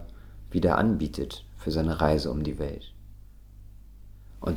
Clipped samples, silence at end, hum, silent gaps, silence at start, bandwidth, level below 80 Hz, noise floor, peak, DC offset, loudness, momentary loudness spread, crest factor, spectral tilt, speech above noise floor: under 0.1%; 0 s; none; none; 0 s; 17 kHz; -40 dBFS; -47 dBFS; -6 dBFS; under 0.1%; -28 LUFS; 20 LU; 22 dB; -7.5 dB/octave; 21 dB